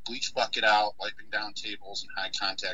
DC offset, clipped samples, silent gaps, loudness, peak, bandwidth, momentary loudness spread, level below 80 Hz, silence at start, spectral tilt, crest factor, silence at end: 1%; under 0.1%; none; -29 LUFS; -10 dBFS; 9.4 kHz; 13 LU; -66 dBFS; 0.05 s; -0.5 dB/octave; 20 dB; 0 s